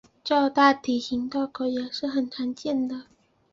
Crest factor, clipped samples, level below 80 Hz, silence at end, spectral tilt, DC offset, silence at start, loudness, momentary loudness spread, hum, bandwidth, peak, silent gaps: 22 dB; under 0.1%; -64 dBFS; 0.5 s; -4 dB/octave; under 0.1%; 0.25 s; -25 LUFS; 11 LU; none; 7.6 kHz; -4 dBFS; none